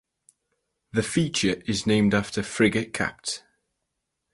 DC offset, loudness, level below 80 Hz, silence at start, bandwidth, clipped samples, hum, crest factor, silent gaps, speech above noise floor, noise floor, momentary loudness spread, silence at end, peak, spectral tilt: under 0.1%; -25 LUFS; -52 dBFS; 0.95 s; 11.5 kHz; under 0.1%; none; 20 dB; none; 56 dB; -81 dBFS; 9 LU; 0.95 s; -6 dBFS; -4.5 dB/octave